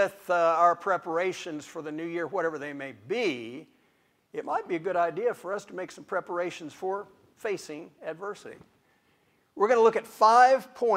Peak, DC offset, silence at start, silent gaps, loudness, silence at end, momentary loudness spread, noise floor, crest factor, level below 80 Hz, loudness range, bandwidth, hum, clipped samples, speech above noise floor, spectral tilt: -8 dBFS; under 0.1%; 0 s; none; -27 LUFS; 0 s; 18 LU; -68 dBFS; 20 dB; -78 dBFS; 10 LU; 15.5 kHz; none; under 0.1%; 41 dB; -4.5 dB/octave